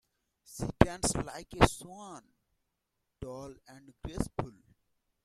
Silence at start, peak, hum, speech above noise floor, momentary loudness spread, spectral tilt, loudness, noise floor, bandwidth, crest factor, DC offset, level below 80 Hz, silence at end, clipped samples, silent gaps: 0.5 s; -2 dBFS; none; 51 dB; 21 LU; -5 dB/octave; -31 LUFS; -83 dBFS; 14 kHz; 34 dB; under 0.1%; -46 dBFS; 0.75 s; under 0.1%; none